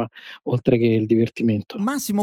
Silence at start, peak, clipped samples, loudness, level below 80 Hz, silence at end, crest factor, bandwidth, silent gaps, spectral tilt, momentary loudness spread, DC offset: 0 s; -4 dBFS; under 0.1%; -21 LUFS; -56 dBFS; 0 s; 16 dB; 18.5 kHz; none; -6.5 dB/octave; 9 LU; under 0.1%